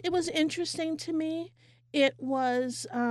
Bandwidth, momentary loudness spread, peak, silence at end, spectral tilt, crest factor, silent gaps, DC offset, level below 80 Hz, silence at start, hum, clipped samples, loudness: 12.5 kHz; 7 LU; -14 dBFS; 0 s; -3.5 dB/octave; 16 dB; none; under 0.1%; -70 dBFS; 0 s; none; under 0.1%; -30 LUFS